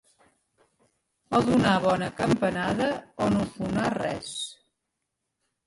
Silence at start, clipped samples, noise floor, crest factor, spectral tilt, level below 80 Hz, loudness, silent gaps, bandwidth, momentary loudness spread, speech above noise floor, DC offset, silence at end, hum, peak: 1.3 s; under 0.1%; -82 dBFS; 18 dB; -5.5 dB/octave; -54 dBFS; -26 LUFS; none; 11.5 kHz; 10 LU; 57 dB; under 0.1%; 1.15 s; none; -10 dBFS